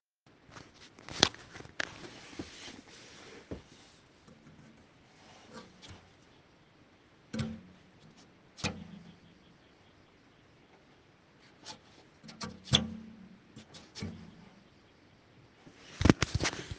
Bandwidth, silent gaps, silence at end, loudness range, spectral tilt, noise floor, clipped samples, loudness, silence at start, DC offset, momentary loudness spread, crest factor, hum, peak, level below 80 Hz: 10 kHz; none; 0 s; 18 LU; -4 dB/octave; -63 dBFS; under 0.1%; -34 LUFS; 0.5 s; under 0.1%; 29 LU; 40 dB; none; 0 dBFS; -54 dBFS